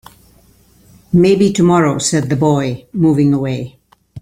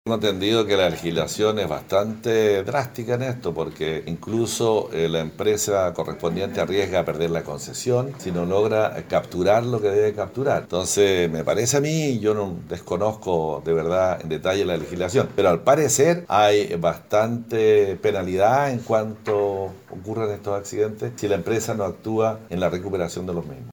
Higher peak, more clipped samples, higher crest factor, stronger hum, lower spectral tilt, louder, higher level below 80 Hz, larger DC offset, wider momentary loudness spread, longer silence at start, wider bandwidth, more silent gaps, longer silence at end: about the same, -2 dBFS vs -4 dBFS; neither; about the same, 14 dB vs 18 dB; neither; first, -6 dB/octave vs -4.5 dB/octave; first, -14 LUFS vs -22 LUFS; first, -46 dBFS vs -54 dBFS; neither; about the same, 10 LU vs 9 LU; first, 1.1 s vs 0.05 s; second, 15 kHz vs over 20 kHz; neither; about the same, 0 s vs 0 s